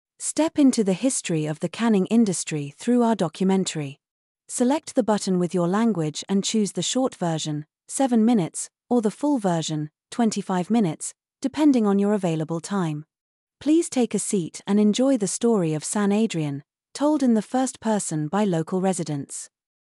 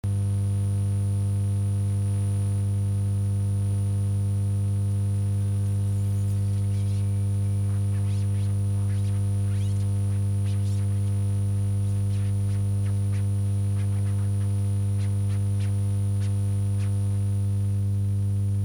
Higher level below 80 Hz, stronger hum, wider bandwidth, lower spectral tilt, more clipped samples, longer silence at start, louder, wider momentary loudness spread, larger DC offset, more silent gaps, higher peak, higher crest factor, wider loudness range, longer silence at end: second, -72 dBFS vs -48 dBFS; second, none vs 50 Hz at -25 dBFS; first, 12 kHz vs 10.5 kHz; second, -5.5 dB/octave vs -7.5 dB/octave; neither; first, 0.2 s vs 0.05 s; first, -23 LUFS vs -26 LUFS; first, 11 LU vs 0 LU; neither; first, 4.11-4.35 s, 13.21-13.47 s vs none; first, -8 dBFS vs -18 dBFS; first, 14 dB vs 6 dB; about the same, 2 LU vs 0 LU; first, 0.4 s vs 0 s